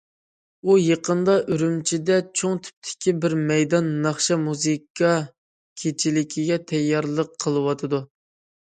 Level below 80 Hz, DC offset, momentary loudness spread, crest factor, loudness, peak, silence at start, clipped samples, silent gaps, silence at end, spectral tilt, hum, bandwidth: -66 dBFS; under 0.1%; 7 LU; 18 dB; -22 LUFS; -6 dBFS; 0.65 s; under 0.1%; 2.73-2.82 s, 4.90-4.95 s, 5.38-5.76 s; 0.6 s; -5 dB/octave; none; 9.6 kHz